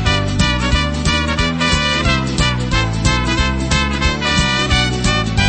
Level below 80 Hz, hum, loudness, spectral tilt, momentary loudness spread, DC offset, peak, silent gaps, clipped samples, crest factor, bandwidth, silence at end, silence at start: -22 dBFS; none; -15 LUFS; -4 dB/octave; 2 LU; under 0.1%; 0 dBFS; none; under 0.1%; 14 dB; 8.8 kHz; 0 s; 0 s